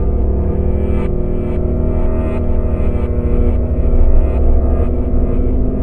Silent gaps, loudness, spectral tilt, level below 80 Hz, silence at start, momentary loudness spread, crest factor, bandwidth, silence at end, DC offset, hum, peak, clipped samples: none; -17 LUFS; -11.5 dB/octave; -14 dBFS; 0 s; 3 LU; 12 dB; 3 kHz; 0 s; 6%; none; 0 dBFS; under 0.1%